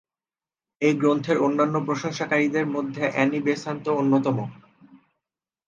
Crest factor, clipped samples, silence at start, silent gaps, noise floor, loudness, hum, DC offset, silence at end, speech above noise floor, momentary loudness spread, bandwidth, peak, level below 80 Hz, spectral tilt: 18 dB; under 0.1%; 0.8 s; none; under -90 dBFS; -23 LUFS; none; under 0.1%; 0.7 s; over 67 dB; 6 LU; 7.6 kHz; -6 dBFS; -72 dBFS; -6.5 dB/octave